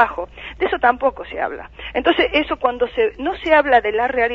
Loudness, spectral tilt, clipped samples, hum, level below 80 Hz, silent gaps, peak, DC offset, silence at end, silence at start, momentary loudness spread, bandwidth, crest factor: -18 LUFS; -6 dB/octave; under 0.1%; none; -42 dBFS; none; 0 dBFS; under 0.1%; 0 s; 0 s; 10 LU; 6.8 kHz; 18 dB